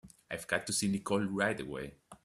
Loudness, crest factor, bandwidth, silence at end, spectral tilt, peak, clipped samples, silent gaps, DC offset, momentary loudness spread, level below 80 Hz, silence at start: -34 LUFS; 22 dB; 13.5 kHz; 0.1 s; -4 dB/octave; -14 dBFS; under 0.1%; none; under 0.1%; 12 LU; -64 dBFS; 0.05 s